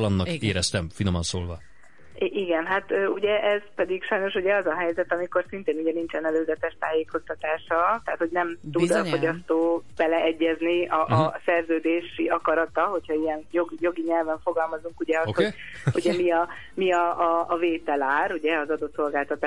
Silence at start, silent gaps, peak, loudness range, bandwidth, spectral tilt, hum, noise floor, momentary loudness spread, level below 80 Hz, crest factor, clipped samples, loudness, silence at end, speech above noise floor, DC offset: 0 s; none; -8 dBFS; 3 LU; 11.5 kHz; -5.5 dB/octave; none; -50 dBFS; 5 LU; -56 dBFS; 18 dB; under 0.1%; -25 LUFS; 0 s; 25 dB; 0.5%